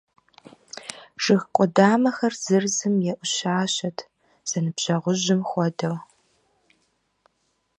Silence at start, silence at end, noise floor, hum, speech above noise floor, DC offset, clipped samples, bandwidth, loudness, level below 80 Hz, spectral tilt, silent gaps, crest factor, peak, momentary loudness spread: 0.75 s; 1.75 s; -71 dBFS; none; 49 dB; under 0.1%; under 0.1%; 11 kHz; -23 LUFS; -72 dBFS; -4.5 dB/octave; none; 22 dB; -2 dBFS; 18 LU